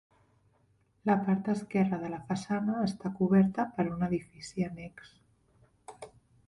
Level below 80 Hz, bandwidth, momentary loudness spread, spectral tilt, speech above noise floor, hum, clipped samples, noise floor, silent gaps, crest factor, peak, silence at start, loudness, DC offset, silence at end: -64 dBFS; 11 kHz; 20 LU; -7.5 dB/octave; 39 dB; none; under 0.1%; -69 dBFS; none; 18 dB; -14 dBFS; 1.05 s; -31 LUFS; under 0.1%; 0.4 s